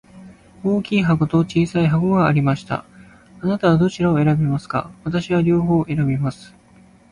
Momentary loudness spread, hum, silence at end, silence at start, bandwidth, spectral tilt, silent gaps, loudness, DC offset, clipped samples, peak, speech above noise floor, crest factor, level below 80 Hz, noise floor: 9 LU; none; 0.65 s; 0.15 s; 10.5 kHz; -8 dB/octave; none; -19 LUFS; under 0.1%; under 0.1%; -4 dBFS; 32 dB; 14 dB; -46 dBFS; -49 dBFS